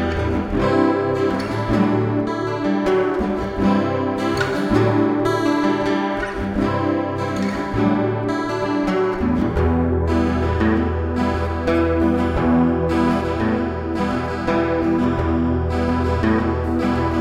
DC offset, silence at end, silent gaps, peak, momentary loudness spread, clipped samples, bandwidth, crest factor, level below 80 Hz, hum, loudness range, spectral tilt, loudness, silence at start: under 0.1%; 0 s; none; -4 dBFS; 5 LU; under 0.1%; 12 kHz; 14 dB; -34 dBFS; none; 1 LU; -7.5 dB/octave; -20 LUFS; 0 s